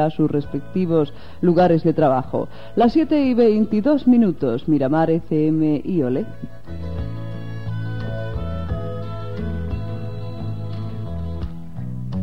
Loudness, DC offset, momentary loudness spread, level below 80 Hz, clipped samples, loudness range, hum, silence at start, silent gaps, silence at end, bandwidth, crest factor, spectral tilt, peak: -21 LUFS; 2%; 15 LU; -38 dBFS; under 0.1%; 11 LU; none; 0 s; none; 0 s; 6 kHz; 14 dB; -10 dB/octave; -6 dBFS